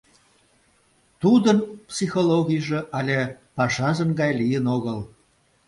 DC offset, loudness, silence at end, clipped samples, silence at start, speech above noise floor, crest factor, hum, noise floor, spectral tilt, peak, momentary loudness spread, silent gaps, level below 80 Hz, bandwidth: under 0.1%; -22 LUFS; 0.6 s; under 0.1%; 1.2 s; 41 dB; 18 dB; none; -62 dBFS; -6 dB/octave; -4 dBFS; 12 LU; none; -58 dBFS; 11.5 kHz